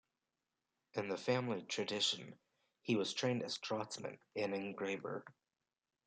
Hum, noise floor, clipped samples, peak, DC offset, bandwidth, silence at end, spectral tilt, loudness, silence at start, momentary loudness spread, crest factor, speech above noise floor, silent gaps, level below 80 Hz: none; under -90 dBFS; under 0.1%; -22 dBFS; under 0.1%; 9.6 kHz; 0.75 s; -4 dB/octave; -40 LUFS; 0.95 s; 11 LU; 20 dB; over 50 dB; none; -88 dBFS